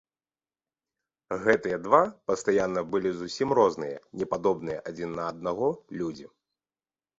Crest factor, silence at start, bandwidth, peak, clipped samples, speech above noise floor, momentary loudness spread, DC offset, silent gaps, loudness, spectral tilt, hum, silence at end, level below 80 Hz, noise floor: 22 dB; 1.3 s; 8 kHz; -6 dBFS; under 0.1%; over 63 dB; 12 LU; under 0.1%; none; -28 LUFS; -5.5 dB/octave; none; 0.95 s; -62 dBFS; under -90 dBFS